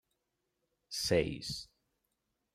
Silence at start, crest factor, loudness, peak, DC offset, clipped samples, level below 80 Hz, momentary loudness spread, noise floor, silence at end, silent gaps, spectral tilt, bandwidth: 0.9 s; 22 dB; -35 LUFS; -16 dBFS; under 0.1%; under 0.1%; -60 dBFS; 13 LU; -84 dBFS; 0.9 s; none; -4 dB/octave; 16 kHz